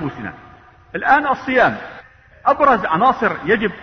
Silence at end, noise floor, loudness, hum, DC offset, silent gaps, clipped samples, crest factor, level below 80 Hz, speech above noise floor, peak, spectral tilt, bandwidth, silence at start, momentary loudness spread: 0 s; -43 dBFS; -16 LUFS; none; under 0.1%; none; under 0.1%; 16 dB; -48 dBFS; 26 dB; -2 dBFS; -6.5 dB/octave; 6.4 kHz; 0 s; 16 LU